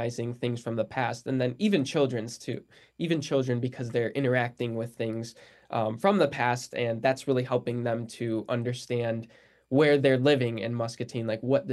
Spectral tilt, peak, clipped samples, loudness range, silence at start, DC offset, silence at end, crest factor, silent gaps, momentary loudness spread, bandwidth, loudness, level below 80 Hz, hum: -6 dB/octave; -10 dBFS; under 0.1%; 3 LU; 0 s; under 0.1%; 0 s; 18 dB; none; 10 LU; 12.5 kHz; -28 LUFS; -70 dBFS; none